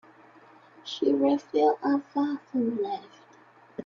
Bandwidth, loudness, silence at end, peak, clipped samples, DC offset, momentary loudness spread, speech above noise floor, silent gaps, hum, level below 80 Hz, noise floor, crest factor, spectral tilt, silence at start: 7 kHz; -27 LUFS; 0 s; -12 dBFS; under 0.1%; under 0.1%; 14 LU; 30 dB; none; none; -74 dBFS; -56 dBFS; 16 dB; -6 dB/octave; 0.85 s